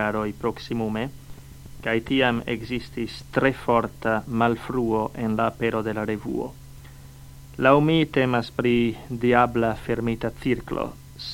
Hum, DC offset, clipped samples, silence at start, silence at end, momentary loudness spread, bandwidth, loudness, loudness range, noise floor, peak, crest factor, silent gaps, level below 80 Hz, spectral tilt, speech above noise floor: none; under 0.1%; under 0.1%; 0 s; 0 s; 11 LU; 17 kHz; -24 LUFS; 4 LU; -43 dBFS; -2 dBFS; 22 dB; none; -46 dBFS; -7 dB/octave; 20 dB